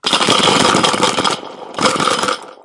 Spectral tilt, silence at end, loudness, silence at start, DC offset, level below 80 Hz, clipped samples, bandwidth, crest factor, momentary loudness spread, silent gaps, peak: -2.5 dB/octave; 0.1 s; -13 LUFS; 0.05 s; under 0.1%; -54 dBFS; under 0.1%; 12 kHz; 16 dB; 9 LU; none; 0 dBFS